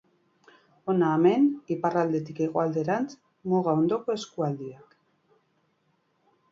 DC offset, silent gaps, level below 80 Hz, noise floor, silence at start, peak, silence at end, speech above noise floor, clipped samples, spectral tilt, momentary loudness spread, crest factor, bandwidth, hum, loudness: under 0.1%; none; -72 dBFS; -71 dBFS; 0.85 s; -10 dBFS; 1.75 s; 45 dB; under 0.1%; -7.5 dB/octave; 14 LU; 18 dB; 7.8 kHz; none; -26 LUFS